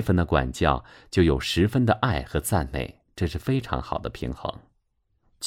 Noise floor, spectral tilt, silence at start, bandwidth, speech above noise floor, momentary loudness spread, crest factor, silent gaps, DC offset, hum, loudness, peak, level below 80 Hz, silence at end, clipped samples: -71 dBFS; -6 dB/octave; 0 s; 16.5 kHz; 47 dB; 11 LU; 20 dB; none; under 0.1%; none; -25 LUFS; -6 dBFS; -38 dBFS; 0 s; under 0.1%